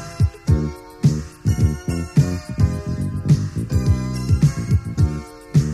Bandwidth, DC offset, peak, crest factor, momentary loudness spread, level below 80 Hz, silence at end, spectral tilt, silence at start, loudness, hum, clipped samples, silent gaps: 13 kHz; under 0.1%; -4 dBFS; 14 dB; 6 LU; -30 dBFS; 0 s; -7.5 dB/octave; 0 s; -21 LUFS; none; under 0.1%; none